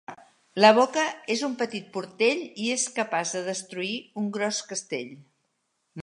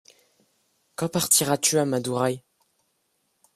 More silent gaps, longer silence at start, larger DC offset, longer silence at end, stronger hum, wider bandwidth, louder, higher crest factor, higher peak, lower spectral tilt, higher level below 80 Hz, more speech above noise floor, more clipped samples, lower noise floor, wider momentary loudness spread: neither; second, 0.1 s vs 1 s; neither; second, 0 s vs 1.2 s; neither; second, 11.5 kHz vs 15.5 kHz; second, -26 LUFS vs -22 LUFS; about the same, 24 dB vs 24 dB; about the same, -2 dBFS vs -4 dBFS; about the same, -3 dB/octave vs -3 dB/octave; second, -80 dBFS vs -64 dBFS; about the same, 50 dB vs 49 dB; neither; about the same, -75 dBFS vs -72 dBFS; about the same, 15 LU vs 14 LU